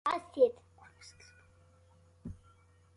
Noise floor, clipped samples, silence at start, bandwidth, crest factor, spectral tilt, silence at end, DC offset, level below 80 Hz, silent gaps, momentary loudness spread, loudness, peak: -64 dBFS; under 0.1%; 0.05 s; 11 kHz; 22 dB; -5.5 dB/octave; 0.65 s; under 0.1%; -62 dBFS; none; 25 LU; -31 LUFS; -14 dBFS